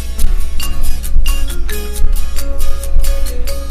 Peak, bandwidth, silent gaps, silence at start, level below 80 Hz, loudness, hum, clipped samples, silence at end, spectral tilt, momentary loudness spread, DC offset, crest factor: 0 dBFS; 15 kHz; none; 0 s; -12 dBFS; -21 LUFS; none; 0.9%; 0 s; -4 dB/octave; 4 LU; under 0.1%; 8 dB